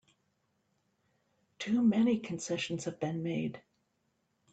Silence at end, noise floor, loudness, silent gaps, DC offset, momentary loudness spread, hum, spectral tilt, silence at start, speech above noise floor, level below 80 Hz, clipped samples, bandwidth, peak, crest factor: 0.95 s; -78 dBFS; -33 LUFS; none; under 0.1%; 10 LU; none; -5.5 dB/octave; 1.6 s; 47 dB; -74 dBFS; under 0.1%; 9 kHz; -18 dBFS; 16 dB